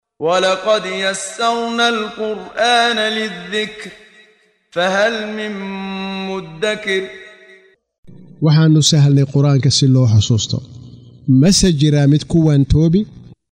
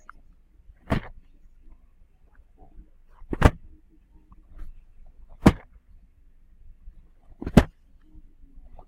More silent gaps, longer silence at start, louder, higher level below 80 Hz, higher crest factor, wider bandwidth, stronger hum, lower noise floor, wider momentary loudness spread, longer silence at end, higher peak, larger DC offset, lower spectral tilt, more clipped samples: first, 7.98-8.03 s vs none; second, 0.2 s vs 0.9 s; first, -15 LUFS vs -24 LUFS; about the same, -36 dBFS vs -36 dBFS; second, 14 dB vs 26 dB; second, 11 kHz vs 16 kHz; neither; about the same, -54 dBFS vs -55 dBFS; second, 13 LU vs 28 LU; second, 0.2 s vs 1.2 s; about the same, -2 dBFS vs -2 dBFS; neither; second, -5 dB/octave vs -7 dB/octave; neither